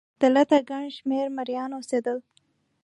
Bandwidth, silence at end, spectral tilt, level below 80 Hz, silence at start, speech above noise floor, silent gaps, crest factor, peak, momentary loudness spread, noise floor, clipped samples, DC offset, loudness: 11.5 kHz; 0.65 s; -4 dB/octave; -80 dBFS; 0.2 s; 43 dB; none; 18 dB; -8 dBFS; 12 LU; -67 dBFS; under 0.1%; under 0.1%; -25 LUFS